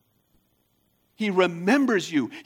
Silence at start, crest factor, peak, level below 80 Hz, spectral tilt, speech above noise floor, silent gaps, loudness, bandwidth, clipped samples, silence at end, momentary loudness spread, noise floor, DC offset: 1.2 s; 18 dB; -6 dBFS; -76 dBFS; -5.5 dB/octave; 46 dB; none; -23 LUFS; 16 kHz; under 0.1%; 0.05 s; 6 LU; -69 dBFS; under 0.1%